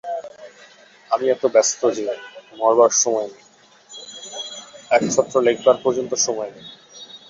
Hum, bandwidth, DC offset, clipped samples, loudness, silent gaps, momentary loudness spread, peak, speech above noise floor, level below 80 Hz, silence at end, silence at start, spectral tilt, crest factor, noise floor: none; 7.8 kHz; under 0.1%; under 0.1%; -19 LUFS; none; 23 LU; -2 dBFS; 31 dB; -66 dBFS; 0.1 s; 0.05 s; -2.5 dB/octave; 20 dB; -49 dBFS